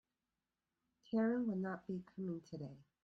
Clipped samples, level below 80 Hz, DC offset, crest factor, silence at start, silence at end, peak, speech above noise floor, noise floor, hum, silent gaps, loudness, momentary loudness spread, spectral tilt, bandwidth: under 0.1%; -80 dBFS; under 0.1%; 16 dB; 1.1 s; 0.2 s; -28 dBFS; over 49 dB; under -90 dBFS; none; none; -42 LUFS; 14 LU; -9 dB/octave; 6.4 kHz